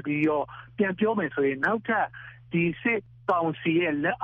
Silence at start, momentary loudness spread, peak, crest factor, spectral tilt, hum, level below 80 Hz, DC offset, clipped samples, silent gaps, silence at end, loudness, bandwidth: 0 s; 6 LU; -12 dBFS; 14 dB; -5 dB/octave; none; -62 dBFS; under 0.1%; under 0.1%; none; 0 s; -26 LUFS; 5 kHz